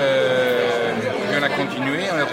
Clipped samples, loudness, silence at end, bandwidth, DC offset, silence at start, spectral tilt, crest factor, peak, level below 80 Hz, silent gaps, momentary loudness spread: under 0.1%; -20 LUFS; 0 s; 16.5 kHz; under 0.1%; 0 s; -4.5 dB/octave; 14 dB; -6 dBFS; -58 dBFS; none; 4 LU